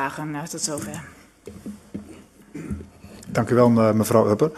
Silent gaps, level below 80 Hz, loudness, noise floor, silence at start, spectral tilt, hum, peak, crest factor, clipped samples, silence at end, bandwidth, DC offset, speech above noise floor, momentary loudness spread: none; -50 dBFS; -21 LUFS; -46 dBFS; 0 s; -6 dB/octave; none; -2 dBFS; 22 dB; under 0.1%; 0 s; 13.5 kHz; under 0.1%; 25 dB; 23 LU